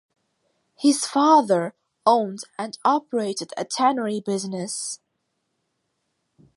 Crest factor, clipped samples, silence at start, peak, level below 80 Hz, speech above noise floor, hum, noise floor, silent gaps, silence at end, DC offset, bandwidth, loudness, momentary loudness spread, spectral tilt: 20 dB; under 0.1%; 0.8 s; -4 dBFS; -78 dBFS; 54 dB; none; -75 dBFS; none; 1.6 s; under 0.1%; 11.5 kHz; -22 LUFS; 14 LU; -4 dB/octave